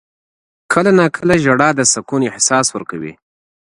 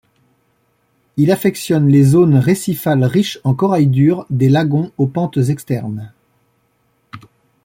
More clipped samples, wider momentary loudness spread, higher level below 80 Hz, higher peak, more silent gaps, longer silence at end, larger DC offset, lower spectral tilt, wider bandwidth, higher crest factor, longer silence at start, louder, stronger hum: neither; first, 14 LU vs 10 LU; about the same, -52 dBFS vs -54 dBFS; about the same, 0 dBFS vs -2 dBFS; neither; first, 0.65 s vs 0.45 s; neither; second, -3.5 dB/octave vs -7.5 dB/octave; second, 11.5 kHz vs 16.5 kHz; about the same, 16 dB vs 14 dB; second, 0.7 s vs 1.15 s; about the same, -13 LUFS vs -14 LUFS; neither